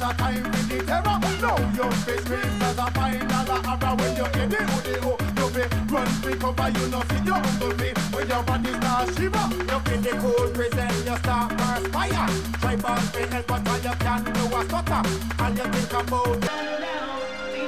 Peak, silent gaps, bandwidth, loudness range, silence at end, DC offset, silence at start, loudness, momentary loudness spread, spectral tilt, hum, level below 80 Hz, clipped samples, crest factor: -10 dBFS; none; 16 kHz; 1 LU; 0 s; 0.8%; 0 s; -25 LUFS; 3 LU; -5 dB/octave; none; -34 dBFS; under 0.1%; 14 dB